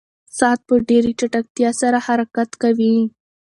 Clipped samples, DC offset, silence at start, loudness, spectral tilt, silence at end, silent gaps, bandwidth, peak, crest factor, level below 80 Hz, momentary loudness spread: under 0.1%; under 0.1%; 0.35 s; -18 LUFS; -4.5 dB/octave; 0.35 s; 1.50-1.55 s; 11.5 kHz; 0 dBFS; 18 dB; -54 dBFS; 6 LU